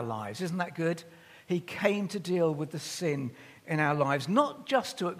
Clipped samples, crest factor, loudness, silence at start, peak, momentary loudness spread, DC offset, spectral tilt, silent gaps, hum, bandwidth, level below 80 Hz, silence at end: under 0.1%; 20 dB; -31 LUFS; 0 s; -10 dBFS; 9 LU; under 0.1%; -5.5 dB/octave; none; none; 15.5 kHz; -76 dBFS; 0 s